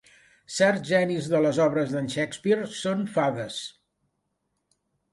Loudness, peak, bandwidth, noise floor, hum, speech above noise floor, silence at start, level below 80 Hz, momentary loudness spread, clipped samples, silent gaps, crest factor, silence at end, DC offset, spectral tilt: -25 LUFS; -6 dBFS; 11.5 kHz; -77 dBFS; none; 53 dB; 0.5 s; -68 dBFS; 11 LU; under 0.1%; none; 20 dB; 1.45 s; under 0.1%; -5 dB/octave